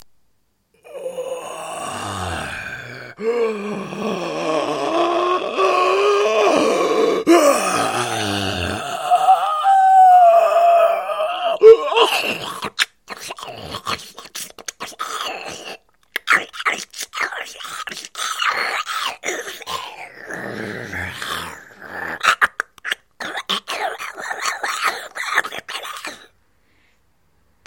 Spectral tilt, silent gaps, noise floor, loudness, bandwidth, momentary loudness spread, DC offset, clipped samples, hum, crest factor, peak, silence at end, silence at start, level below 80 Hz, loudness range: -3 dB/octave; none; -65 dBFS; -18 LUFS; 17 kHz; 17 LU; under 0.1%; under 0.1%; none; 20 dB; 0 dBFS; 1.5 s; 0 s; -56 dBFS; 12 LU